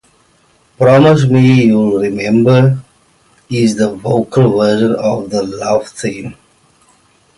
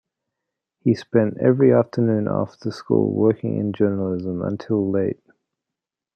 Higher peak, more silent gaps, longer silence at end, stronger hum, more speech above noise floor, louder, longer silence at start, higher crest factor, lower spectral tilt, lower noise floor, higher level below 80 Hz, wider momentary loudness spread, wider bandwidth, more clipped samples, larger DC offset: about the same, 0 dBFS vs -2 dBFS; neither; about the same, 1.05 s vs 1.05 s; neither; second, 42 dB vs 66 dB; first, -12 LUFS vs -21 LUFS; about the same, 0.8 s vs 0.85 s; second, 12 dB vs 18 dB; second, -7 dB/octave vs -9.5 dB/octave; second, -52 dBFS vs -86 dBFS; first, -48 dBFS vs -64 dBFS; first, 13 LU vs 10 LU; first, 11.5 kHz vs 8.2 kHz; neither; neither